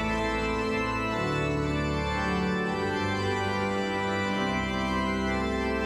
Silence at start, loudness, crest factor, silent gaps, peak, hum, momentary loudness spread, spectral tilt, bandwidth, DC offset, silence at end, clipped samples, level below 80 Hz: 0 s; -28 LUFS; 12 dB; none; -16 dBFS; none; 1 LU; -5.5 dB/octave; 14 kHz; under 0.1%; 0 s; under 0.1%; -40 dBFS